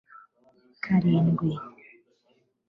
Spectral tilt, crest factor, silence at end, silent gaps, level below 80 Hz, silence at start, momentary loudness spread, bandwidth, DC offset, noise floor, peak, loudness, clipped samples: -10.5 dB/octave; 16 dB; 1 s; none; -62 dBFS; 0.85 s; 16 LU; 5.6 kHz; under 0.1%; -69 dBFS; -12 dBFS; -25 LUFS; under 0.1%